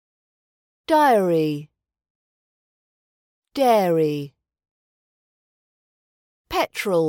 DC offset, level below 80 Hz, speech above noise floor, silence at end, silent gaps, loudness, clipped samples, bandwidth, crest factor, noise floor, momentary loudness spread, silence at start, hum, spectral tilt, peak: under 0.1%; -62 dBFS; over 71 dB; 0 s; 2.10-3.42 s, 4.71-6.45 s; -20 LUFS; under 0.1%; 17 kHz; 18 dB; under -90 dBFS; 16 LU; 0.9 s; none; -5.5 dB/octave; -6 dBFS